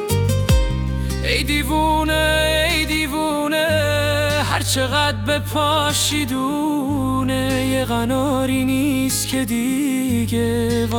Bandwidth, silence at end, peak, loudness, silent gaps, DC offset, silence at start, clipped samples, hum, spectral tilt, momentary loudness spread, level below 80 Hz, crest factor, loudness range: over 20 kHz; 0 s; -4 dBFS; -19 LUFS; none; under 0.1%; 0 s; under 0.1%; none; -4.5 dB/octave; 4 LU; -30 dBFS; 14 dB; 2 LU